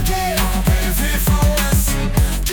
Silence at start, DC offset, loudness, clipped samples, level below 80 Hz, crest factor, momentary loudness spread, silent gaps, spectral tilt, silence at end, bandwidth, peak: 0 s; under 0.1%; -17 LUFS; under 0.1%; -18 dBFS; 12 dB; 3 LU; none; -4.5 dB/octave; 0 s; 19.5 kHz; -4 dBFS